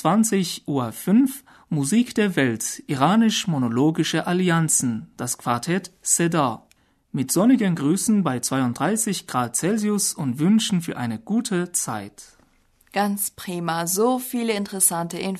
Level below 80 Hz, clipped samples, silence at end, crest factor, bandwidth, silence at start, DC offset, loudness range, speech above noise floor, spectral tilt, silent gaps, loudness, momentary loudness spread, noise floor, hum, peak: -62 dBFS; under 0.1%; 0 s; 18 dB; 13.5 kHz; 0 s; under 0.1%; 4 LU; 38 dB; -4.5 dB/octave; none; -22 LUFS; 9 LU; -60 dBFS; none; -4 dBFS